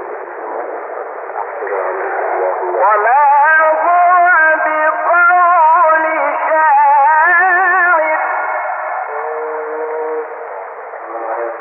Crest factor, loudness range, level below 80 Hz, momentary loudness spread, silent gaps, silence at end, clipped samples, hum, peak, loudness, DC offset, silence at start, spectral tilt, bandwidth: 10 dB; 8 LU; under -90 dBFS; 15 LU; none; 0 s; under 0.1%; none; -2 dBFS; -12 LUFS; under 0.1%; 0 s; -5 dB/octave; 3.2 kHz